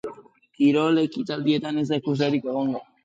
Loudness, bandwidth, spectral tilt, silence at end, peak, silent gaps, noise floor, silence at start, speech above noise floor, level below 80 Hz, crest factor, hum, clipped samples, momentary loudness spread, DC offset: -23 LUFS; 7.8 kHz; -7 dB/octave; 0.2 s; -10 dBFS; none; -48 dBFS; 0.05 s; 26 dB; -70 dBFS; 14 dB; none; under 0.1%; 7 LU; under 0.1%